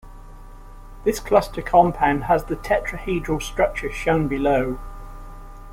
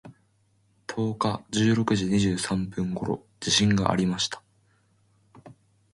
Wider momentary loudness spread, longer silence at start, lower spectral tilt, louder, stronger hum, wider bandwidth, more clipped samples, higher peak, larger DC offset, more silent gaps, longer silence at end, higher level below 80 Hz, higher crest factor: first, 19 LU vs 10 LU; about the same, 0.05 s vs 0.05 s; first, -6 dB/octave vs -4.5 dB/octave; first, -21 LUFS vs -25 LUFS; neither; first, 16.5 kHz vs 11.5 kHz; neither; first, -2 dBFS vs -6 dBFS; neither; neither; second, 0 s vs 0.4 s; first, -36 dBFS vs -52 dBFS; about the same, 20 dB vs 22 dB